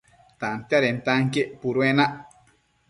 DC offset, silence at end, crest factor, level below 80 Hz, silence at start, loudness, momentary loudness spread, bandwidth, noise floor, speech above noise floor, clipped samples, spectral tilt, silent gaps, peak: under 0.1%; 0.65 s; 18 dB; -62 dBFS; 0.4 s; -23 LUFS; 10 LU; 11.5 kHz; -62 dBFS; 39 dB; under 0.1%; -6 dB/octave; none; -6 dBFS